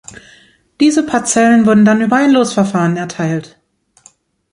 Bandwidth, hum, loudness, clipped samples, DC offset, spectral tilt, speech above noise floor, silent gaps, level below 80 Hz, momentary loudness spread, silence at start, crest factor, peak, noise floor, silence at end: 11.5 kHz; none; -12 LUFS; under 0.1%; under 0.1%; -5 dB/octave; 37 dB; none; -54 dBFS; 9 LU; 0.8 s; 12 dB; -2 dBFS; -49 dBFS; 1.05 s